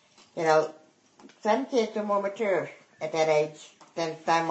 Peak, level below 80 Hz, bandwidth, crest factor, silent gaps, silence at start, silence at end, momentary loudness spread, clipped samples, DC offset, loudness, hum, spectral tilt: -8 dBFS; -80 dBFS; 8.4 kHz; 20 dB; none; 0.35 s; 0 s; 14 LU; under 0.1%; under 0.1%; -27 LUFS; none; -4.5 dB/octave